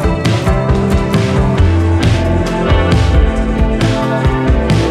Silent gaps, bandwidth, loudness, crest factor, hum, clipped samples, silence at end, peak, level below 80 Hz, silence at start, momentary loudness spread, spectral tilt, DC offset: none; 12.5 kHz; -13 LUFS; 10 dB; none; under 0.1%; 0 s; -2 dBFS; -16 dBFS; 0 s; 3 LU; -7 dB/octave; under 0.1%